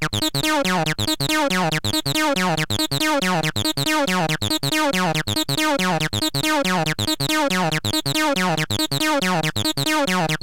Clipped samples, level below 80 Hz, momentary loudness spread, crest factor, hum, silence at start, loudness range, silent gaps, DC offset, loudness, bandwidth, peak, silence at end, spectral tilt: under 0.1%; -46 dBFS; 2 LU; 10 dB; none; 0 s; 0 LU; none; 1%; -20 LUFS; 17 kHz; -10 dBFS; 0.05 s; -3.5 dB/octave